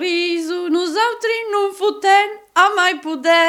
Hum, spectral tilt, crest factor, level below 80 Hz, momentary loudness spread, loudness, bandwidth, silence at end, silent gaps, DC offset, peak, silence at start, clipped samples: none; -0.5 dB/octave; 16 dB; -68 dBFS; 6 LU; -17 LUFS; 16.5 kHz; 0 s; none; under 0.1%; 0 dBFS; 0 s; under 0.1%